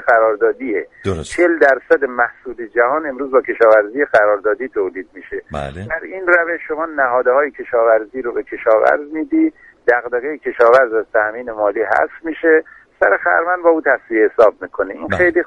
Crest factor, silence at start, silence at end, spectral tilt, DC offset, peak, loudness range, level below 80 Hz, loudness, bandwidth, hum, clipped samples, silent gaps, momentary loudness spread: 16 dB; 0 s; 0 s; -6 dB/octave; under 0.1%; 0 dBFS; 2 LU; -48 dBFS; -16 LUFS; 10.5 kHz; none; under 0.1%; none; 11 LU